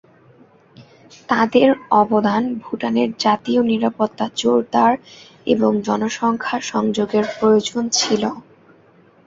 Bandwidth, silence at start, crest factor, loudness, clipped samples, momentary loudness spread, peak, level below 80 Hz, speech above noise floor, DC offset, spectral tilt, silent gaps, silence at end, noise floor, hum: 7.8 kHz; 0.8 s; 18 dB; -18 LUFS; under 0.1%; 7 LU; -2 dBFS; -60 dBFS; 33 dB; under 0.1%; -4.5 dB/octave; none; 0.85 s; -51 dBFS; none